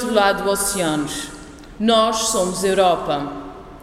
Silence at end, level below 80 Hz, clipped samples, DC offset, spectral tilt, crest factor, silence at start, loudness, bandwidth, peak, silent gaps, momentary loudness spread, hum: 0 s; -44 dBFS; under 0.1%; under 0.1%; -3 dB/octave; 18 dB; 0 s; -19 LUFS; 16 kHz; -2 dBFS; none; 16 LU; none